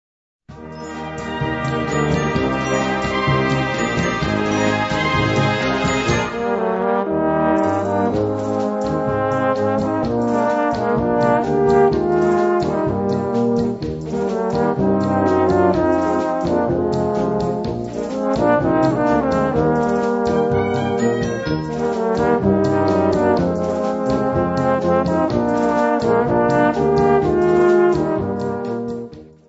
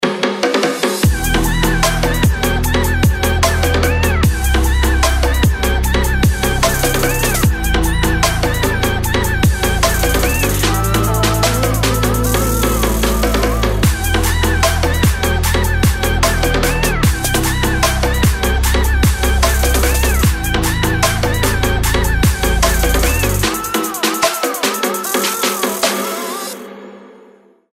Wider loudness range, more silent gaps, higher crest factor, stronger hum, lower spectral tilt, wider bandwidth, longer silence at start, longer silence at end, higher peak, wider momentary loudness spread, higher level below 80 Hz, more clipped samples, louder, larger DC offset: about the same, 2 LU vs 1 LU; neither; first, 16 dB vs 10 dB; neither; first, -6.5 dB/octave vs -4 dB/octave; second, 8 kHz vs 16.5 kHz; first, 0.5 s vs 0 s; second, 0.25 s vs 0.65 s; about the same, -2 dBFS vs -4 dBFS; first, 7 LU vs 2 LU; second, -40 dBFS vs -18 dBFS; neither; second, -18 LUFS vs -15 LUFS; neither